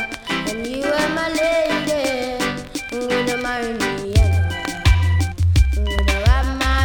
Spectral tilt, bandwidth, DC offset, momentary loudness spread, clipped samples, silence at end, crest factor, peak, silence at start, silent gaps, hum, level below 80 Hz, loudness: -5.5 dB/octave; 18.5 kHz; under 0.1%; 6 LU; under 0.1%; 0 s; 16 dB; -2 dBFS; 0 s; none; none; -22 dBFS; -20 LUFS